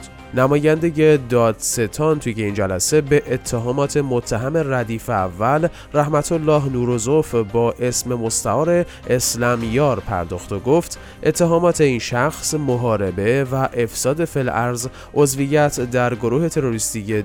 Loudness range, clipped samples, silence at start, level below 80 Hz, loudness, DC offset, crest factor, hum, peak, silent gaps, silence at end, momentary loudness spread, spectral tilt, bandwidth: 2 LU; under 0.1%; 0 s; -42 dBFS; -19 LUFS; under 0.1%; 16 dB; none; -2 dBFS; none; 0 s; 6 LU; -5 dB/octave; 18.5 kHz